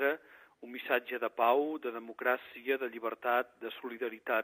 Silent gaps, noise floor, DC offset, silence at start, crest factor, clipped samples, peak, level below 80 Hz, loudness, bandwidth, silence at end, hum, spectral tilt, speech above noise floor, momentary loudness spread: none; -55 dBFS; under 0.1%; 0 s; 20 dB; under 0.1%; -14 dBFS; -84 dBFS; -34 LUFS; 15.5 kHz; 0 s; none; -5.5 dB/octave; 21 dB; 13 LU